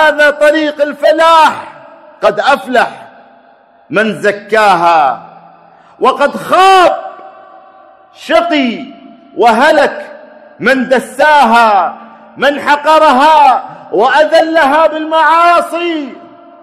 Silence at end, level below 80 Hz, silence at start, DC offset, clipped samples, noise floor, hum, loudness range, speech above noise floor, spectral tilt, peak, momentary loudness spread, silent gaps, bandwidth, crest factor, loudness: 0.35 s; -52 dBFS; 0 s; under 0.1%; 0.7%; -44 dBFS; none; 5 LU; 35 dB; -3.5 dB/octave; 0 dBFS; 12 LU; none; 14 kHz; 10 dB; -9 LUFS